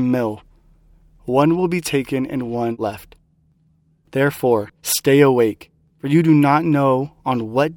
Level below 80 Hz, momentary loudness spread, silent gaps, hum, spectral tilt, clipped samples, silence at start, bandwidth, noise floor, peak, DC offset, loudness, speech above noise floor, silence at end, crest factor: -54 dBFS; 13 LU; none; none; -6 dB/octave; under 0.1%; 0 s; 18.5 kHz; -59 dBFS; 0 dBFS; under 0.1%; -18 LUFS; 42 dB; 0 s; 18 dB